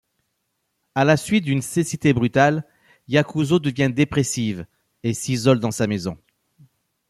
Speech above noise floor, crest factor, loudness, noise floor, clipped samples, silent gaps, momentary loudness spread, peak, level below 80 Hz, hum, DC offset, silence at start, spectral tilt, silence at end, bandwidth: 54 dB; 18 dB; -21 LUFS; -74 dBFS; under 0.1%; none; 9 LU; -4 dBFS; -54 dBFS; none; under 0.1%; 0.95 s; -5.5 dB/octave; 0.95 s; 13.5 kHz